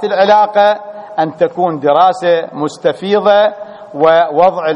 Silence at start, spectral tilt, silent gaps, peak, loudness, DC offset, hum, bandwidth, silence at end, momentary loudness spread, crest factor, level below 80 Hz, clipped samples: 0 s; -5.5 dB/octave; none; 0 dBFS; -12 LUFS; under 0.1%; none; 10 kHz; 0 s; 10 LU; 12 dB; -58 dBFS; under 0.1%